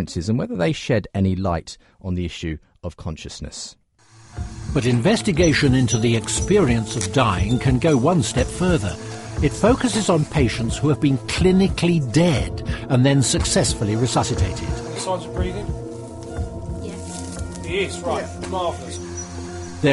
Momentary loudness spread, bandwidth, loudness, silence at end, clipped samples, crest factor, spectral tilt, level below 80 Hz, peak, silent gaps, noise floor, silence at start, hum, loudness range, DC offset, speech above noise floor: 15 LU; 11.5 kHz; -21 LUFS; 0 s; under 0.1%; 16 dB; -5.5 dB/octave; -34 dBFS; -4 dBFS; none; -49 dBFS; 0 s; none; 9 LU; under 0.1%; 30 dB